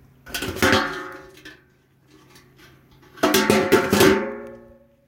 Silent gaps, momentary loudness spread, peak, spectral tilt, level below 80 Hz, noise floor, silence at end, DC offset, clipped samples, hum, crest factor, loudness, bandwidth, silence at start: none; 21 LU; -2 dBFS; -4 dB/octave; -50 dBFS; -58 dBFS; 0.5 s; under 0.1%; under 0.1%; none; 20 dB; -19 LUFS; 17 kHz; 0.25 s